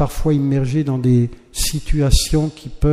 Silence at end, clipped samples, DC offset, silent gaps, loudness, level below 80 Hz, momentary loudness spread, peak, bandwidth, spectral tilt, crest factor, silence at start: 0 s; under 0.1%; under 0.1%; none; -18 LUFS; -22 dBFS; 6 LU; 0 dBFS; 15.5 kHz; -6 dB/octave; 16 dB; 0 s